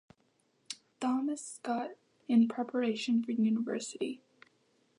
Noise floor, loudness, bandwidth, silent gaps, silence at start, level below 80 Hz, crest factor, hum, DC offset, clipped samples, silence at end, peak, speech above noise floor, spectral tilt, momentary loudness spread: -73 dBFS; -33 LUFS; 11 kHz; none; 0.7 s; -88 dBFS; 18 dB; none; under 0.1%; under 0.1%; 0.8 s; -16 dBFS; 42 dB; -5 dB/octave; 18 LU